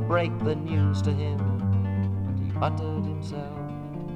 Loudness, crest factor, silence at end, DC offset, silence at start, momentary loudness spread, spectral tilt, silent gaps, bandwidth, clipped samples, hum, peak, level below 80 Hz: -27 LUFS; 16 dB; 0 s; under 0.1%; 0 s; 10 LU; -8.5 dB/octave; none; 7.4 kHz; under 0.1%; none; -10 dBFS; -50 dBFS